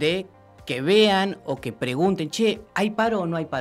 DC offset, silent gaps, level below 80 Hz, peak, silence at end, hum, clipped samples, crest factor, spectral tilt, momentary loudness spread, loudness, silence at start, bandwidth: under 0.1%; none; -58 dBFS; -8 dBFS; 0 s; none; under 0.1%; 16 dB; -5 dB/octave; 13 LU; -23 LUFS; 0 s; 14.5 kHz